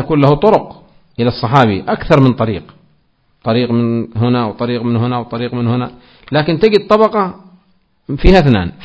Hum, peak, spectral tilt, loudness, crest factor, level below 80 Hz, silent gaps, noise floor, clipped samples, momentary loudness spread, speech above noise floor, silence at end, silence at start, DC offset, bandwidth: none; 0 dBFS; -8.5 dB/octave; -13 LUFS; 14 dB; -28 dBFS; none; -58 dBFS; 0.7%; 10 LU; 45 dB; 0 s; 0 s; under 0.1%; 8 kHz